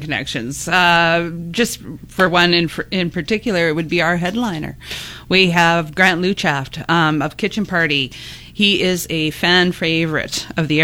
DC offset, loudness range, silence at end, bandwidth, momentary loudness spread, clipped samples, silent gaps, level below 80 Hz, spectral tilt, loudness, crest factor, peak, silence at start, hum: under 0.1%; 2 LU; 0 s; 17 kHz; 11 LU; under 0.1%; none; -44 dBFS; -4.5 dB/octave; -16 LUFS; 16 dB; 0 dBFS; 0 s; none